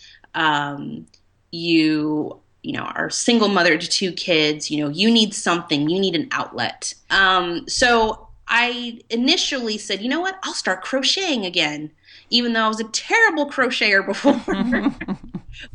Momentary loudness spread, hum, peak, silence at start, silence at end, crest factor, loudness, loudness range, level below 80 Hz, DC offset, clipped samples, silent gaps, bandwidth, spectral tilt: 14 LU; none; -4 dBFS; 0.35 s; 0.05 s; 18 dB; -19 LUFS; 2 LU; -50 dBFS; under 0.1%; under 0.1%; none; 10.5 kHz; -3 dB/octave